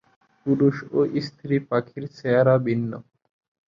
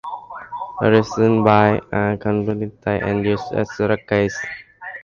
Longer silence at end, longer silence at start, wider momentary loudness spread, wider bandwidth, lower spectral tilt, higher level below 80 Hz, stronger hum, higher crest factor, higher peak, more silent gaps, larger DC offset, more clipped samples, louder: first, 0.7 s vs 0 s; first, 0.45 s vs 0.05 s; about the same, 14 LU vs 16 LU; about the same, 7.2 kHz vs 7.2 kHz; first, -9 dB/octave vs -7 dB/octave; second, -64 dBFS vs -46 dBFS; neither; about the same, 18 dB vs 18 dB; second, -6 dBFS vs 0 dBFS; neither; neither; neither; second, -23 LUFS vs -19 LUFS